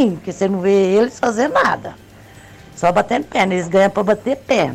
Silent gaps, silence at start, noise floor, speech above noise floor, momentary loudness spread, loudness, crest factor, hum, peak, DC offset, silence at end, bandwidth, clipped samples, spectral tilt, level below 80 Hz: none; 0 s; -41 dBFS; 25 dB; 5 LU; -17 LUFS; 12 dB; none; -4 dBFS; under 0.1%; 0 s; 14.5 kHz; under 0.1%; -5.5 dB/octave; -50 dBFS